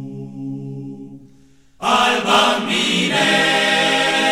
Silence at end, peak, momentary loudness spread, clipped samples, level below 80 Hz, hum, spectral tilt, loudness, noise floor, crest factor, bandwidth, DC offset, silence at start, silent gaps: 0 s; -2 dBFS; 17 LU; under 0.1%; -56 dBFS; none; -3 dB/octave; -15 LUFS; -51 dBFS; 16 dB; 17 kHz; 0.3%; 0 s; none